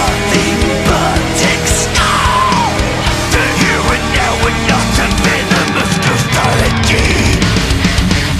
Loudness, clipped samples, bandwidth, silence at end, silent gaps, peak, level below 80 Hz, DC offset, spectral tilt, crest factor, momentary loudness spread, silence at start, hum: -11 LUFS; under 0.1%; 15 kHz; 0 s; none; 0 dBFS; -20 dBFS; under 0.1%; -4 dB/octave; 12 dB; 2 LU; 0 s; none